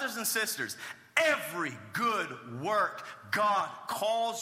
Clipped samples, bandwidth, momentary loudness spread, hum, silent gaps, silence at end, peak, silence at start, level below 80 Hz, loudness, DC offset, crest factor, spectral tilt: under 0.1%; 16 kHz; 9 LU; none; none; 0 s; -8 dBFS; 0 s; -82 dBFS; -31 LUFS; under 0.1%; 24 dB; -2.5 dB/octave